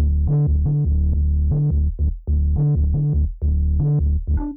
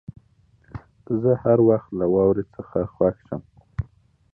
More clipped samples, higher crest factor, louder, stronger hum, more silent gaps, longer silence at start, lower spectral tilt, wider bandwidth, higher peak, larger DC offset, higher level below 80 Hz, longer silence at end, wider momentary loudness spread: neither; second, 6 dB vs 18 dB; about the same, -20 LUFS vs -21 LUFS; neither; neither; second, 0 s vs 0.75 s; first, -16.5 dB/octave vs -13 dB/octave; second, 1.5 kHz vs 2.6 kHz; second, -10 dBFS vs -6 dBFS; neither; first, -20 dBFS vs -48 dBFS; second, 0 s vs 0.5 s; second, 3 LU vs 23 LU